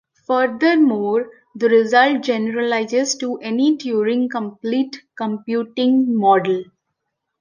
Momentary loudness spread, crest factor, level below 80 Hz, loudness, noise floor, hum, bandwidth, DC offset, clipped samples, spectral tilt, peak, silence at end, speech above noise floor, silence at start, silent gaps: 10 LU; 16 dB; -72 dBFS; -18 LUFS; -77 dBFS; none; 10 kHz; under 0.1%; under 0.1%; -4.5 dB/octave; -2 dBFS; 0.8 s; 59 dB; 0.3 s; none